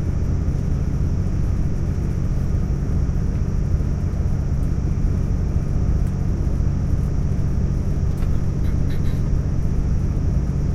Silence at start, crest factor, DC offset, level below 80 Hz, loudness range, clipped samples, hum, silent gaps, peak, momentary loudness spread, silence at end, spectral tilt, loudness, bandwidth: 0 s; 12 dB; under 0.1%; -22 dBFS; 1 LU; under 0.1%; none; none; -6 dBFS; 1 LU; 0 s; -8.5 dB/octave; -23 LUFS; 7.6 kHz